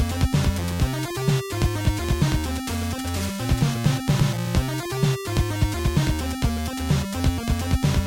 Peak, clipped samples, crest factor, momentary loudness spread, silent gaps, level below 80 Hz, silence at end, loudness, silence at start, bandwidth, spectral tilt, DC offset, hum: -6 dBFS; under 0.1%; 16 dB; 5 LU; none; -30 dBFS; 0 s; -24 LUFS; 0 s; 17 kHz; -5.5 dB/octave; under 0.1%; none